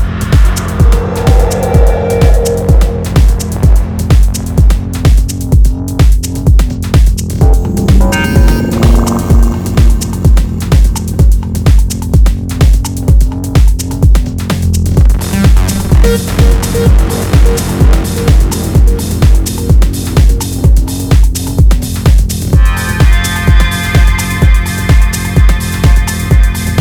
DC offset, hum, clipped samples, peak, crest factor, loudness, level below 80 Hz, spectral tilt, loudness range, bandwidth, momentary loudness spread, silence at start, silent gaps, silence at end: under 0.1%; none; 1%; 0 dBFS; 8 dB; -10 LUFS; -10 dBFS; -6 dB/octave; 1 LU; 17.5 kHz; 2 LU; 0 s; none; 0 s